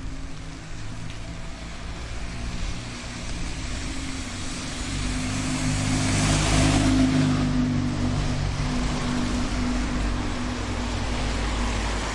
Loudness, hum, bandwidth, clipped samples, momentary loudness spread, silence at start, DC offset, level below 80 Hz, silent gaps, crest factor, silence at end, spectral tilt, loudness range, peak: -26 LUFS; none; 11.5 kHz; under 0.1%; 16 LU; 0 s; under 0.1%; -32 dBFS; none; 16 dB; 0 s; -4.5 dB/octave; 11 LU; -8 dBFS